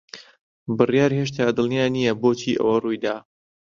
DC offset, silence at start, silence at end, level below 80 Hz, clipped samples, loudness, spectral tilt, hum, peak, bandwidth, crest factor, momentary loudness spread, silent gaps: under 0.1%; 0.15 s; 0.6 s; -60 dBFS; under 0.1%; -21 LUFS; -6 dB/octave; none; -2 dBFS; 7.4 kHz; 20 dB; 15 LU; 0.41-0.66 s